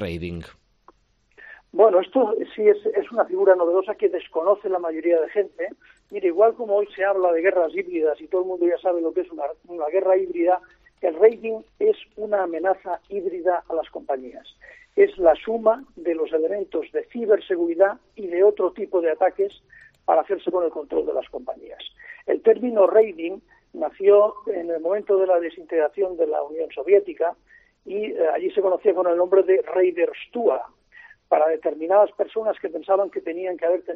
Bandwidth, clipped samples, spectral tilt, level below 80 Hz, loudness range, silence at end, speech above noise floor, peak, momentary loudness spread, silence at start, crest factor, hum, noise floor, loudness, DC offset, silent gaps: 4.5 kHz; under 0.1%; -4.5 dB/octave; -60 dBFS; 3 LU; 0 s; 37 dB; -2 dBFS; 12 LU; 0 s; 20 dB; none; -59 dBFS; -22 LUFS; under 0.1%; none